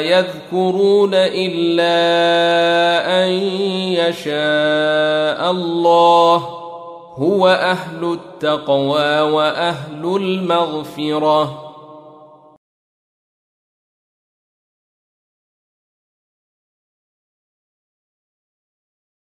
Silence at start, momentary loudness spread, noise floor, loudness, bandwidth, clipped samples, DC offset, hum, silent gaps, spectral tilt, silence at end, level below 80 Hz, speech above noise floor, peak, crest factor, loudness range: 0 s; 9 LU; -43 dBFS; -16 LUFS; 14 kHz; under 0.1%; under 0.1%; none; none; -5.5 dB/octave; 7.2 s; -66 dBFS; 28 dB; -2 dBFS; 16 dB; 7 LU